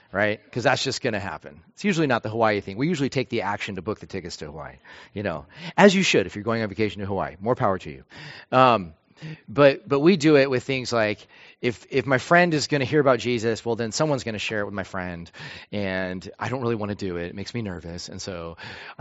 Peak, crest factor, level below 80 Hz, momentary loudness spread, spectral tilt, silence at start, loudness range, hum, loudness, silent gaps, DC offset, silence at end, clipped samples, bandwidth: 0 dBFS; 24 dB; -56 dBFS; 18 LU; -4 dB/octave; 0.15 s; 8 LU; none; -23 LUFS; none; under 0.1%; 0.05 s; under 0.1%; 8 kHz